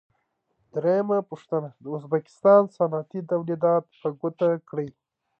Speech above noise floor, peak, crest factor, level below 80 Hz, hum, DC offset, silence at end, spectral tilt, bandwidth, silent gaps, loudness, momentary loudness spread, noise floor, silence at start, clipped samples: 49 dB; -6 dBFS; 20 dB; -76 dBFS; none; under 0.1%; 0.5 s; -9.5 dB/octave; 8 kHz; none; -25 LUFS; 15 LU; -73 dBFS; 0.75 s; under 0.1%